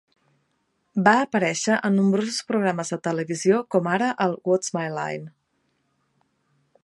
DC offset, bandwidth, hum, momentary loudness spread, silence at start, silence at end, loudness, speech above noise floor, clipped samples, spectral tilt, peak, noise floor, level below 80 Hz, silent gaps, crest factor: under 0.1%; 11.5 kHz; none; 9 LU; 0.95 s; 1.55 s; -23 LUFS; 49 dB; under 0.1%; -5 dB/octave; -2 dBFS; -71 dBFS; -72 dBFS; none; 22 dB